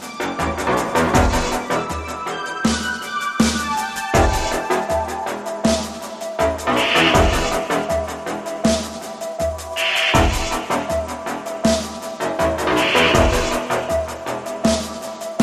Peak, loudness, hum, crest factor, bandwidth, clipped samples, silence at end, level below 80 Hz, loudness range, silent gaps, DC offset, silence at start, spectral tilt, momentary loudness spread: -2 dBFS; -20 LUFS; none; 18 dB; 15.5 kHz; under 0.1%; 0 s; -32 dBFS; 2 LU; none; under 0.1%; 0 s; -4 dB/octave; 12 LU